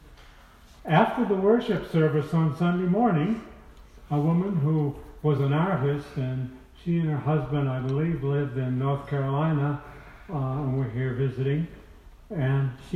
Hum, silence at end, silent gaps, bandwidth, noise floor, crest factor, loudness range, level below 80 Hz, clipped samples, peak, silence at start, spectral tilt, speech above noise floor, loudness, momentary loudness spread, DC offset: none; 0 s; none; 6.4 kHz; -51 dBFS; 20 dB; 4 LU; -50 dBFS; under 0.1%; -6 dBFS; 0.05 s; -9.5 dB/octave; 26 dB; -26 LUFS; 9 LU; under 0.1%